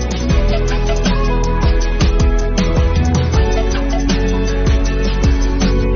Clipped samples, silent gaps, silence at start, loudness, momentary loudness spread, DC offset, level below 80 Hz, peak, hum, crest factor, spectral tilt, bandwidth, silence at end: under 0.1%; none; 0 s; -16 LUFS; 3 LU; under 0.1%; -14 dBFS; -2 dBFS; none; 10 dB; -6 dB/octave; 7.2 kHz; 0 s